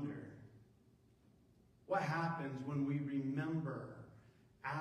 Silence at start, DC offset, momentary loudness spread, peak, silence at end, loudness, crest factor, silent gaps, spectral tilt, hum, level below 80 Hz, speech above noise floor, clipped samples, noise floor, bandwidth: 0 s; under 0.1%; 18 LU; -24 dBFS; 0 s; -41 LUFS; 18 dB; none; -8 dB/octave; none; -76 dBFS; 30 dB; under 0.1%; -69 dBFS; 10.5 kHz